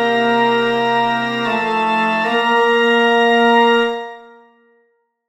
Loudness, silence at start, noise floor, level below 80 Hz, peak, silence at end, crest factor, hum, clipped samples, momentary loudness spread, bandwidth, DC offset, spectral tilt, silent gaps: -14 LUFS; 0 s; -62 dBFS; -56 dBFS; -2 dBFS; 1.05 s; 14 dB; none; under 0.1%; 6 LU; 13 kHz; under 0.1%; -4.5 dB/octave; none